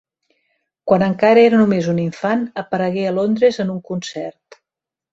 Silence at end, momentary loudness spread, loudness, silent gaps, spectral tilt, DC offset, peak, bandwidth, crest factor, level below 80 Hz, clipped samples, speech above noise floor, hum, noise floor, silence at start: 0.85 s; 15 LU; -17 LUFS; none; -7 dB/octave; under 0.1%; -2 dBFS; 7.8 kHz; 16 dB; -58 dBFS; under 0.1%; 71 dB; none; -87 dBFS; 0.85 s